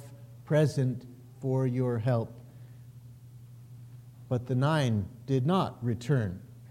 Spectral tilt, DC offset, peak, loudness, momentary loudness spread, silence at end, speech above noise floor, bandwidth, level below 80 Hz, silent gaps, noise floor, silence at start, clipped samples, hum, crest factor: -7.5 dB/octave; under 0.1%; -16 dBFS; -30 LUFS; 23 LU; 0.05 s; 21 dB; 13 kHz; -62 dBFS; none; -49 dBFS; 0 s; under 0.1%; none; 16 dB